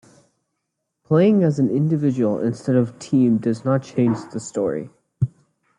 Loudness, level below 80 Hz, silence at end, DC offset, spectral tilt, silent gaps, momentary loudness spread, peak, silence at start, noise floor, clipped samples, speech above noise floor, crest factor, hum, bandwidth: -20 LUFS; -60 dBFS; 0.5 s; under 0.1%; -8 dB/octave; none; 10 LU; -4 dBFS; 1.1 s; -77 dBFS; under 0.1%; 58 dB; 16 dB; none; 10.5 kHz